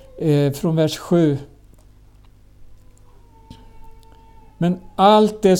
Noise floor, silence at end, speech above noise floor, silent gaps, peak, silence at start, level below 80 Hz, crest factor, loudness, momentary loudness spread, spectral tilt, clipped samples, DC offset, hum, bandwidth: -48 dBFS; 0 s; 31 dB; none; -2 dBFS; 0.15 s; -48 dBFS; 18 dB; -18 LUFS; 9 LU; -6.5 dB/octave; under 0.1%; under 0.1%; 50 Hz at -50 dBFS; 17 kHz